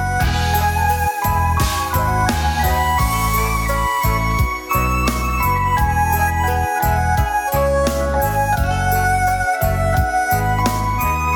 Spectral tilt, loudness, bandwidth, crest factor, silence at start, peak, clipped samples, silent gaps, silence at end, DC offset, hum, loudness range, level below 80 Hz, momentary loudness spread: -5 dB/octave; -18 LUFS; 19 kHz; 16 dB; 0 s; -2 dBFS; under 0.1%; none; 0 s; under 0.1%; none; 0 LU; -24 dBFS; 2 LU